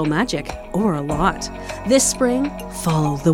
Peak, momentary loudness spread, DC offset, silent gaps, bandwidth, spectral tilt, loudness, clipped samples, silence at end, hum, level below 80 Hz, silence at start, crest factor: -4 dBFS; 11 LU; under 0.1%; none; 16.5 kHz; -4.5 dB/octave; -20 LUFS; under 0.1%; 0 s; none; -36 dBFS; 0 s; 16 dB